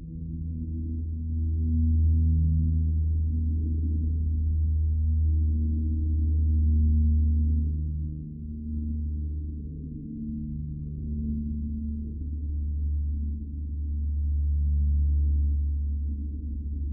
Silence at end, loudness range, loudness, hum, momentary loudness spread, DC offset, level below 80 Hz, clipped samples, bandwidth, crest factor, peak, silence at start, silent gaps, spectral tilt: 0 s; 8 LU; -28 LUFS; none; 11 LU; under 0.1%; -30 dBFS; under 0.1%; 0.5 kHz; 10 dB; -16 dBFS; 0 s; none; -19.5 dB/octave